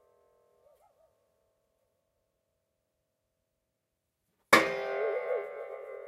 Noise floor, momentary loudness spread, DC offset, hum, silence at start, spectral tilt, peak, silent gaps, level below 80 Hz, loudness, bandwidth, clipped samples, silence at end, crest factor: -84 dBFS; 18 LU; under 0.1%; none; 4.5 s; -2.5 dB/octave; -6 dBFS; none; -76 dBFS; -28 LUFS; 16 kHz; under 0.1%; 0 s; 30 dB